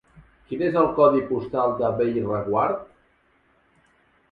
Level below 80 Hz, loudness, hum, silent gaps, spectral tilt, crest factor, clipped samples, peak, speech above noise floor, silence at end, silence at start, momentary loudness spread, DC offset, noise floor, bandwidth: -56 dBFS; -22 LUFS; none; none; -10 dB/octave; 20 dB; under 0.1%; -4 dBFS; 41 dB; 1.45 s; 0.5 s; 9 LU; under 0.1%; -63 dBFS; 5.2 kHz